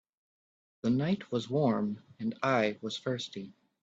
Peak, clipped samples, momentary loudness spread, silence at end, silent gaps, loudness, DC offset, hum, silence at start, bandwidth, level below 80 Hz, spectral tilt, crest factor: -14 dBFS; under 0.1%; 10 LU; 0.3 s; none; -32 LUFS; under 0.1%; none; 0.85 s; 8 kHz; -72 dBFS; -6.5 dB/octave; 20 dB